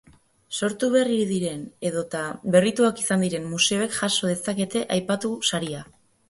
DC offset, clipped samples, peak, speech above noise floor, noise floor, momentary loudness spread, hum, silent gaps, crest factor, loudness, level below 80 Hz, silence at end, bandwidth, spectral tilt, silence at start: under 0.1%; under 0.1%; -4 dBFS; 21 dB; -45 dBFS; 9 LU; none; none; 22 dB; -24 LUFS; -64 dBFS; 0.45 s; 12 kHz; -4 dB/octave; 0.5 s